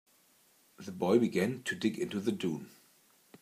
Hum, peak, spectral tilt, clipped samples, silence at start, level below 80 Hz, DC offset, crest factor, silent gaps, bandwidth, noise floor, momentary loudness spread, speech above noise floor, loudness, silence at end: none; -14 dBFS; -6 dB/octave; under 0.1%; 0.8 s; -80 dBFS; under 0.1%; 22 dB; none; 15.5 kHz; -67 dBFS; 18 LU; 35 dB; -33 LUFS; 0.75 s